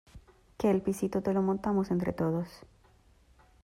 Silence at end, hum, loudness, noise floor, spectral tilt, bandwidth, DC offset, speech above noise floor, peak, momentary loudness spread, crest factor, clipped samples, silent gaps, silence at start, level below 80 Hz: 1.05 s; none; -30 LUFS; -62 dBFS; -8 dB/octave; 15.5 kHz; under 0.1%; 33 dB; -16 dBFS; 3 LU; 16 dB; under 0.1%; none; 0.15 s; -58 dBFS